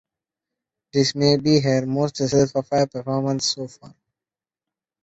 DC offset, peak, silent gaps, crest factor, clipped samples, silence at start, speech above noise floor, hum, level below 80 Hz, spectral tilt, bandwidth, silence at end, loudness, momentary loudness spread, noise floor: under 0.1%; -4 dBFS; none; 18 dB; under 0.1%; 0.95 s; over 70 dB; none; -56 dBFS; -5.5 dB/octave; 8.2 kHz; 1.15 s; -21 LUFS; 7 LU; under -90 dBFS